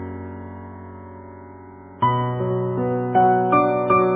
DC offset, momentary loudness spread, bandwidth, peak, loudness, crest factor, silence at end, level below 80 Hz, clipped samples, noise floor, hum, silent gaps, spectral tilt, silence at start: under 0.1%; 23 LU; 3.8 kHz; -6 dBFS; -20 LUFS; 16 dB; 0 s; -48 dBFS; under 0.1%; -41 dBFS; none; none; -11.5 dB/octave; 0 s